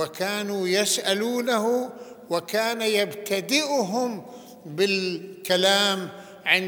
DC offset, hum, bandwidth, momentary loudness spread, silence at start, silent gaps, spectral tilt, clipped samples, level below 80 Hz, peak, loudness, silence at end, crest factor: under 0.1%; none; over 20 kHz; 14 LU; 0 s; none; -2.5 dB/octave; under 0.1%; -76 dBFS; -4 dBFS; -24 LUFS; 0 s; 20 dB